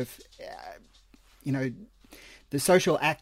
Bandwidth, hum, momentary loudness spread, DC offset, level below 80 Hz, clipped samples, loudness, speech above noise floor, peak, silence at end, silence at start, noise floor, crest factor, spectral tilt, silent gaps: 16 kHz; none; 25 LU; under 0.1%; -60 dBFS; under 0.1%; -27 LUFS; 31 dB; -8 dBFS; 0.05 s; 0 s; -58 dBFS; 22 dB; -4.5 dB/octave; none